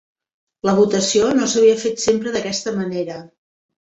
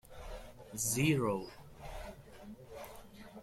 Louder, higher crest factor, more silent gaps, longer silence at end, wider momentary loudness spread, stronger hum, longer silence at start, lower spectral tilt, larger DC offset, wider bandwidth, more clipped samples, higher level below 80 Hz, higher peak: first, -18 LUFS vs -34 LUFS; about the same, 16 dB vs 20 dB; neither; first, 0.55 s vs 0 s; second, 10 LU vs 22 LU; neither; first, 0.65 s vs 0.05 s; about the same, -4 dB/octave vs -4.5 dB/octave; neither; second, 8.2 kHz vs 16.5 kHz; neither; about the same, -56 dBFS vs -56 dBFS; first, -4 dBFS vs -20 dBFS